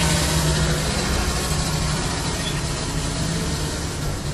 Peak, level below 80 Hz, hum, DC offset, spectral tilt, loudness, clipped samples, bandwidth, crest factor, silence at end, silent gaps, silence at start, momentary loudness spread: -6 dBFS; -28 dBFS; none; under 0.1%; -4 dB/octave; -22 LUFS; under 0.1%; 13 kHz; 16 dB; 0 s; none; 0 s; 6 LU